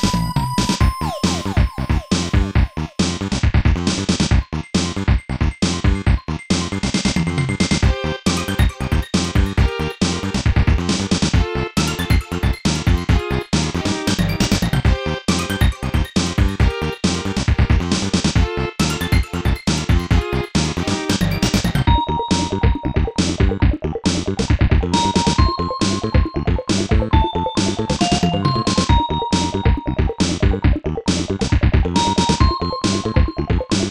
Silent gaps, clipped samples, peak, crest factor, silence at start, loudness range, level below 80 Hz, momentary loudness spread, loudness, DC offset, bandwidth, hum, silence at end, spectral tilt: none; under 0.1%; -2 dBFS; 16 dB; 0 s; 1 LU; -22 dBFS; 4 LU; -19 LUFS; 0.2%; 16 kHz; none; 0 s; -5 dB/octave